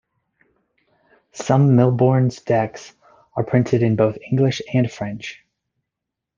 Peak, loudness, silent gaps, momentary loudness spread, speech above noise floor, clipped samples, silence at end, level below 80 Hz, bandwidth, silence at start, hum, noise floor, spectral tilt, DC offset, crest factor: -2 dBFS; -19 LUFS; none; 16 LU; 65 dB; under 0.1%; 1.05 s; -58 dBFS; 7.4 kHz; 1.35 s; none; -83 dBFS; -7.5 dB/octave; under 0.1%; 18 dB